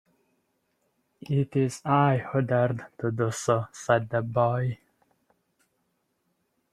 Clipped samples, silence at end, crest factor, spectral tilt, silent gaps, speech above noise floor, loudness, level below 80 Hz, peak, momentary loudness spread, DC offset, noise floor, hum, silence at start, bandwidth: under 0.1%; 1.95 s; 22 dB; -6.5 dB/octave; none; 50 dB; -26 LUFS; -64 dBFS; -6 dBFS; 7 LU; under 0.1%; -75 dBFS; none; 1.3 s; 13 kHz